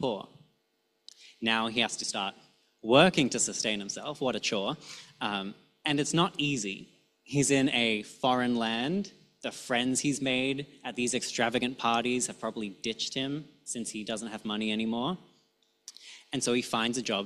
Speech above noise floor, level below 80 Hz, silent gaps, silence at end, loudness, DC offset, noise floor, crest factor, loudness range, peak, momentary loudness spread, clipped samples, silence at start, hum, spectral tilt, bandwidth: 45 dB; -68 dBFS; none; 0 s; -30 LUFS; under 0.1%; -75 dBFS; 22 dB; 6 LU; -8 dBFS; 13 LU; under 0.1%; 0 s; none; -3.5 dB/octave; 13.5 kHz